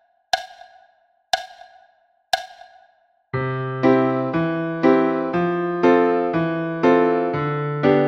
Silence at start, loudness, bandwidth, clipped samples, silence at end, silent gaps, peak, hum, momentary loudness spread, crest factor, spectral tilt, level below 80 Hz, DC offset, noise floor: 0.35 s; -20 LUFS; 14 kHz; under 0.1%; 0 s; none; -2 dBFS; none; 9 LU; 18 dB; -6.5 dB/octave; -58 dBFS; under 0.1%; -60 dBFS